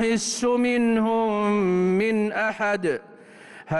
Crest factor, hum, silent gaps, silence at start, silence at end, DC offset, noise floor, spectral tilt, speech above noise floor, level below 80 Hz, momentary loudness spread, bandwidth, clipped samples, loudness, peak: 10 dB; none; none; 0 s; 0 s; under 0.1%; -46 dBFS; -5 dB/octave; 23 dB; -58 dBFS; 4 LU; 12 kHz; under 0.1%; -23 LUFS; -14 dBFS